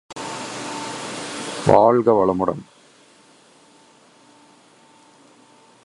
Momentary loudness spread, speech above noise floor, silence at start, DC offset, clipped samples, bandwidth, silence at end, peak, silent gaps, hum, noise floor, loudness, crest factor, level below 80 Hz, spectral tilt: 16 LU; 36 dB; 0.1 s; under 0.1%; under 0.1%; 11.5 kHz; 3.2 s; 0 dBFS; none; none; -52 dBFS; -20 LUFS; 22 dB; -54 dBFS; -5.5 dB/octave